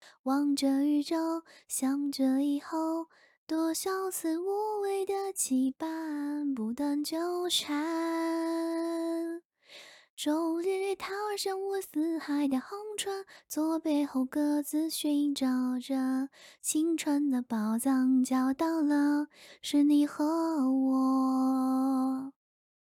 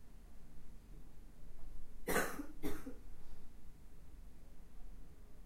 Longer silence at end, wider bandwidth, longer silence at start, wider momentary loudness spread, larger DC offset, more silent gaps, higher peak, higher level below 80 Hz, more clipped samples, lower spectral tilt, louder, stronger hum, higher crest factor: first, 0.65 s vs 0 s; about the same, 17 kHz vs 16 kHz; about the same, 0.05 s vs 0 s; second, 9 LU vs 24 LU; neither; first, 0.19-0.24 s, 3.37-3.47 s, 9.45-9.50 s, 10.10-10.17 s vs none; first, -16 dBFS vs -20 dBFS; second, -78 dBFS vs -52 dBFS; neither; about the same, -3 dB/octave vs -4 dB/octave; first, -30 LUFS vs -43 LUFS; neither; second, 14 dB vs 22 dB